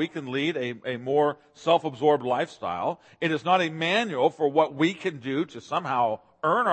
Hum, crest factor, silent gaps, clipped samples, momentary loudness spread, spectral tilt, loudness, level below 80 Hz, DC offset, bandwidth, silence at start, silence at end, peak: none; 18 dB; none; under 0.1%; 8 LU; -5.5 dB/octave; -26 LUFS; -74 dBFS; under 0.1%; 8.8 kHz; 0 s; 0 s; -6 dBFS